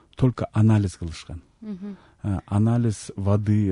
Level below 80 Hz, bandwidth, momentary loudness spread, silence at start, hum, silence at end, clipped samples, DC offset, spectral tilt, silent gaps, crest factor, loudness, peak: -46 dBFS; 11 kHz; 18 LU; 0.2 s; none; 0 s; under 0.1%; under 0.1%; -8 dB/octave; none; 14 dB; -23 LUFS; -8 dBFS